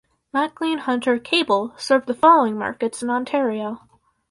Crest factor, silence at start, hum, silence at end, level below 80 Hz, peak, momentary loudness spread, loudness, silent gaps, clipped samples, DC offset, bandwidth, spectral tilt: 18 dB; 0.35 s; none; 0.55 s; -64 dBFS; -2 dBFS; 11 LU; -20 LUFS; none; under 0.1%; under 0.1%; 11.5 kHz; -4 dB/octave